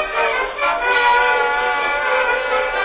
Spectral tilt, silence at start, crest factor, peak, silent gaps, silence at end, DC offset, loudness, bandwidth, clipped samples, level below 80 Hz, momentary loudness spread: -5 dB/octave; 0 s; 14 dB; -2 dBFS; none; 0 s; under 0.1%; -16 LUFS; 4 kHz; under 0.1%; -44 dBFS; 5 LU